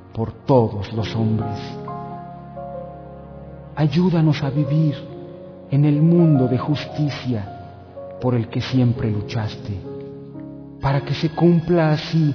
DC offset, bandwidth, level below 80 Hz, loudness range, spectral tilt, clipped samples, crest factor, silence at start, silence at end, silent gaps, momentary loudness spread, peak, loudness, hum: under 0.1%; 5.4 kHz; -48 dBFS; 6 LU; -8.5 dB/octave; under 0.1%; 16 dB; 0 s; 0 s; none; 20 LU; -4 dBFS; -20 LUFS; none